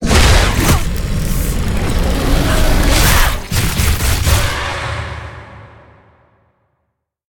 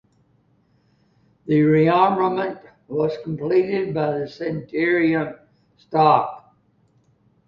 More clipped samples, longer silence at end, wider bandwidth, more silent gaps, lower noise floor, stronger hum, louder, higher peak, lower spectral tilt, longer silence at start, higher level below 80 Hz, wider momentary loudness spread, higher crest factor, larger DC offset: neither; first, 1.65 s vs 1.1 s; first, 18.5 kHz vs 5.8 kHz; neither; first, -70 dBFS vs -61 dBFS; neither; first, -15 LUFS vs -20 LUFS; about the same, 0 dBFS vs -2 dBFS; second, -4 dB/octave vs -9 dB/octave; second, 0 s vs 1.45 s; first, -18 dBFS vs -60 dBFS; about the same, 11 LU vs 13 LU; second, 14 dB vs 20 dB; neither